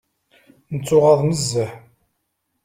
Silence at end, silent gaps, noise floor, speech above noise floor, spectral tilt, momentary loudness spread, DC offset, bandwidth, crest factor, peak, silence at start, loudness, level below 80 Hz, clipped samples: 0.85 s; none; -73 dBFS; 56 dB; -5.5 dB/octave; 15 LU; under 0.1%; 16 kHz; 18 dB; -2 dBFS; 0.7 s; -18 LUFS; -54 dBFS; under 0.1%